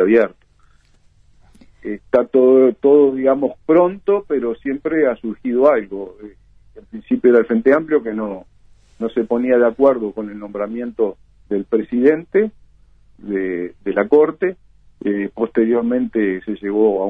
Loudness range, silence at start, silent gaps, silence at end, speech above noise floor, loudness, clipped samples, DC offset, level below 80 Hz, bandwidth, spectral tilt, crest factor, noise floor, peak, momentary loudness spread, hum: 5 LU; 0 s; none; 0 s; 37 dB; -17 LUFS; under 0.1%; under 0.1%; -54 dBFS; 3.8 kHz; -9 dB/octave; 16 dB; -53 dBFS; -2 dBFS; 14 LU; none